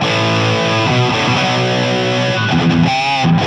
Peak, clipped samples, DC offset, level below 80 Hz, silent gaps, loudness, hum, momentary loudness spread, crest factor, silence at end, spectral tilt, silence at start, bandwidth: -2 dBFS; under 0.1%; under 0.1%; -42 dBFS; none; -14 LUFS; none; 2 LU; 12 dB; 0 s; -5.5 dB/octave; 0 s; 9.8 kHz